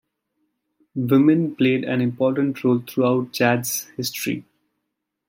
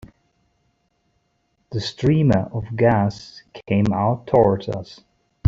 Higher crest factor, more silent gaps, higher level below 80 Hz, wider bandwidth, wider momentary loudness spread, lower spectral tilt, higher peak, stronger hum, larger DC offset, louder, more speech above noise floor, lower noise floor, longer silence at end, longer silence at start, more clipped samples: about the same, 18 dB vs 18 dB; neither; second, -68 dBFS vs -48 dBFS; first, 16.5 kHz vs 7.6 kHz; second, 11 LU vs 18 LU; second, -5.5 dB/octave vs -8 dB/octave; about the same, -4 dBFS vs -4 dBFS; neither; neither; about the same, -21 LUFS vs -20 LUFS; first, 59 dB vs 49 dB; first, -79 dBFS vs -68 dBFS; first, 0.9 s vs 0 s; first, 0.95 s vs 0.05 s; neither